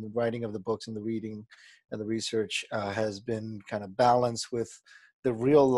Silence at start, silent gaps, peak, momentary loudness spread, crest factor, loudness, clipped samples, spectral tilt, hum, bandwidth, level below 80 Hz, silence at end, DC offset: 0 s; 5.13-5.23 s; -10 dBFS; 15 LU; 20 dB; -30 LUFS; under 0.1%; -5.5 dB/octave; none; 12 kHz; -64 dBFS; 0 s; under 0.1%